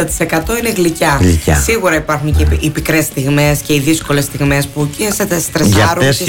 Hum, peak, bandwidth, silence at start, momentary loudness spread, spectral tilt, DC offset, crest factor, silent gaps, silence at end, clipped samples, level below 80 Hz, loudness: none; -2 dBFS; 17 kHz; 0 s; 5 LU; -4.5 dB/octave; under 0.1%; 10 dB; none; 0 s; under 0.1%; -22 dBFS; -13 LUFS